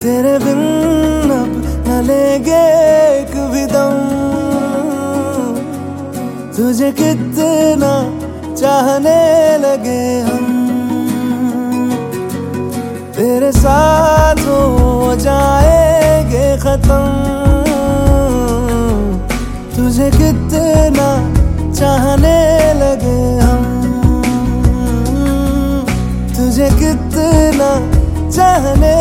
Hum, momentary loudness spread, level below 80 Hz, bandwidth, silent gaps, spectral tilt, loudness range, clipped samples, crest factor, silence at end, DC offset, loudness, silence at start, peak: none; 8 LU; -18 dBFS; 17 kHz; none; -6.5 dB/octave; 5 LU; under 0.1%; 12 dB; 0 s; under 0.1%; -12 LUFS; 0 s; 0 dBFS